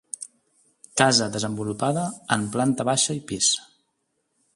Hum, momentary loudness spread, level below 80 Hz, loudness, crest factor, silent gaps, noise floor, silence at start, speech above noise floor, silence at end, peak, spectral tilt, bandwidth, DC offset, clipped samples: none; 11 LU; -62 dBFS; -23 LUFS; 26 dB; none; -74 dBFS; 0.2 s; 51 dB; 0.9 s; 0 dBFS; -3 dB/octave; 11.5 kHz; under 0.1%; under 0.1%